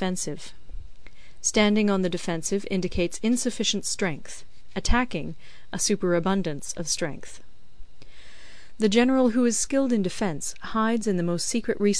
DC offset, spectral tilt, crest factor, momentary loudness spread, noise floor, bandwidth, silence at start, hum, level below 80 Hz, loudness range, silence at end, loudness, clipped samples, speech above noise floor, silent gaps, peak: 2%; -4 dB/octave; 20 dB; 16 LU; -48 dBFS; 11 kHz; 0 s; none; -40 dBFS; 4 LU; 0 s; -25 LUFS; under 0.1%; 23 dB; none; -6 dBFS